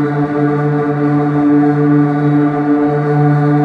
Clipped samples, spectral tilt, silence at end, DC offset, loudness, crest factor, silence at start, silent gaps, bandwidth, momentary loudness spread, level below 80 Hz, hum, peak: under 0.1%; -10.5 dB/octave; 0 s; under 0.1%; -13 LUFS; 10 dB; 0 s; none; 4.8 kHz; 3 LU; -52 dBFS; none; -2 dBFS